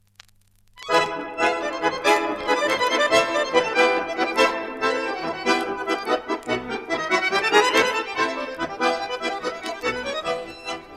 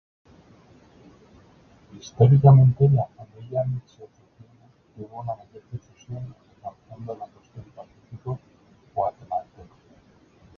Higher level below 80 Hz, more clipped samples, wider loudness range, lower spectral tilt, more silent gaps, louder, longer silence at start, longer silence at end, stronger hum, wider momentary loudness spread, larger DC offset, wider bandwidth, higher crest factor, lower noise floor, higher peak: about the same, -56 dBFS vs -54 dBFS; neither; second, 3 LU vs 18 LU; second, -2.5 dB/octave vs -10 dB/octave; neither; about the same, -22 LUFS vs -21 LUFS; second, 0.75 s vs 1.95 s; second, 0 s vs 1.15 s; neither; second, 9 LU vs 27 LU; neither; first, 15 kHz vs 6.4 kHz; about the same, 20 dB vs 22 dB; about the same, -57 dBFS vs -57 dBFS; about the same, -4 dBFS vs -2 dBFS